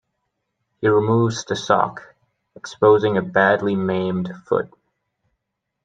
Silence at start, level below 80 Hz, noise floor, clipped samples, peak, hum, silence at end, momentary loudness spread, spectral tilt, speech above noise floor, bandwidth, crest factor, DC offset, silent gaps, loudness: 0.8 s; -62 dBFS; -78 dBFS; under 0.1%; 0 dBFS; none; 1.2 s; 12 LU; -6 dB/octave; 59 dB; 8.6 kHz; 20 dB; under 0.1%; none; -19 LUFS